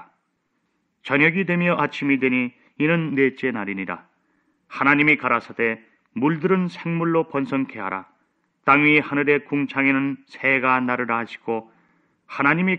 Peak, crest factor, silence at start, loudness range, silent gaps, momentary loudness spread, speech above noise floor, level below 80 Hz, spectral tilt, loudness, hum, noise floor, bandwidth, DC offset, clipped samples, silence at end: -2 dBFS; 20 dB; 1.05 s; 3 LU; none; 13 LU; 51 dB; -66 dBFS; -8 dB/octave; -21 LUFS; none; -72 dBFS; 7.2 kHz; under 0.1%; under 0.1%; 0 s